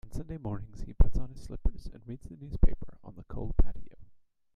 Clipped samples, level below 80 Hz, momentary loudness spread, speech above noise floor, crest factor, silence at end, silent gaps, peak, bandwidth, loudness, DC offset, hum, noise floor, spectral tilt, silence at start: under 0.1%; -32 dBFS; 16 LU; 31 dB; 18 dB; 0.45 s; none; -8 dBFS; 5.2 kHz; -36 LUFS; under 0.1%; none; -58 dBFS; -9 dB/octave; 0.05 s